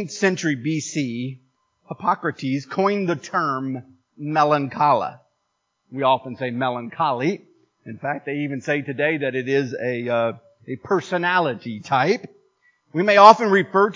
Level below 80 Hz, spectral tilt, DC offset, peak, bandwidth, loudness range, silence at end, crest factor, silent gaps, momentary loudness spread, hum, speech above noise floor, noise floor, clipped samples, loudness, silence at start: -68 dBFS; -5.5 dB/octave; under 0.1%; 0 dBFS; 7.6 kHz; 6 LU; 0 s; 22 dB; none; 14 LU; none; 53 dB; -74 dBFS; under 0.1%; -21 LUFS; 0 s